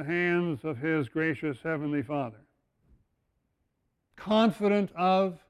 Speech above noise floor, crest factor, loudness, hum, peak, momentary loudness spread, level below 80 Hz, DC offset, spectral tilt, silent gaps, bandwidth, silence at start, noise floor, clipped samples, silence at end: 50 dB; 16 dB; -28 LUFS; none; -12 dBFS; 9 LU; -66 dBFS; under 0.1%; -7.5 dB/octave; none; 12 kHz; 0 s; -78 dBFS; under 0.1%; 0.15 s